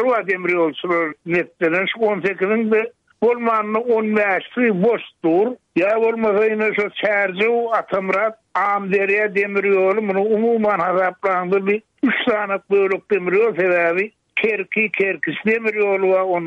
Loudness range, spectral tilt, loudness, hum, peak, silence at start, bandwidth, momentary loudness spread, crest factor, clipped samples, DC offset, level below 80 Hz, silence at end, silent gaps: 1 LU; -7.5 dB/octave; -18 LUFS; none; -6 dBFS; 0 s; 7 kHz; 4 LU; 12 dB; under 0.1%; under 0.1%; -66 dBFS; 0 s; none